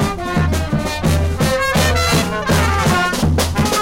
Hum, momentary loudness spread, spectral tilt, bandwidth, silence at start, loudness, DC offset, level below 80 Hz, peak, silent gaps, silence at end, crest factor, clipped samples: none; 4 LU; -4.5 dB/octave; 16.5 kHz; 0 s; -16 LUFS; 0.8%; -26 dBFS; -6 dBFS; none; 0 s; 10 dB; under 0.1%